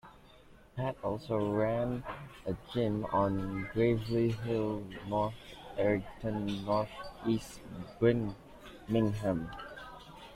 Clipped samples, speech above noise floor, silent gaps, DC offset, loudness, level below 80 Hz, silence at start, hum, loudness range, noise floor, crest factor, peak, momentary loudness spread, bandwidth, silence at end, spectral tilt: under 0.1%; 25 dB; none; under 0.1%; -34 LUFS; -56 dBFS; 0.05 s; none; 2 LU; -58 dBFS; 20 dB; -14 dBFS; 16 LU; 15 kHz; 0 s; -7.5 dB/octave